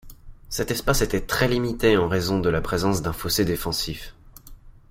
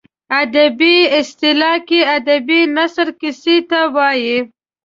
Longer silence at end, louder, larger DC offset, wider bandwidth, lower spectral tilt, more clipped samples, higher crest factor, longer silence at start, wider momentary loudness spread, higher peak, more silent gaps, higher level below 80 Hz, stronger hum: second, 0.2 s vs 0.35 s; second, -23 LUFS vs -13 LUFS; neither; first, 16 kHz vs 7.6 kHz; first, -4.5 dB/octave vs -3 dB/octave; neither; first, 20 dB vs 12 dB; second, 0.05 s vs 0.3 s; about the same, 9 LU vs 8 LU; about the same, -4 dBFS vs -2 dBFS; neither; first, -36 dBFS vs -62 dBFS; neither